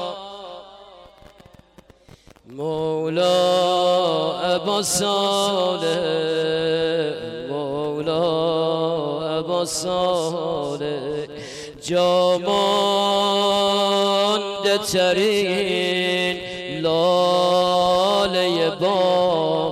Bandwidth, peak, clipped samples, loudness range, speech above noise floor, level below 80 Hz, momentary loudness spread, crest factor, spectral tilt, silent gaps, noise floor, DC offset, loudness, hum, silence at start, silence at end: 15.5 kHz; -10 dBFS; under 0.1%; 4 LU; 30 dB; -56 dBFS; 10 LU; 12 dB; -4 dB/octave; none; -50 dBFS; under 0.1%; -20 LUFS; none; 0 s; 0 s